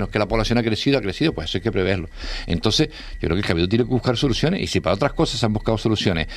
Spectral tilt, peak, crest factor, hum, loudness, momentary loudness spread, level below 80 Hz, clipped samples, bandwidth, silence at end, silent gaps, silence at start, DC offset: -5.5 dB/octave; 0 dBFS; 20 dB; none; -21 LUFS; 5 LU; -34 dBFS; under 0.1%; 14 kHz; 0 s; none; 0 s; under 0.1%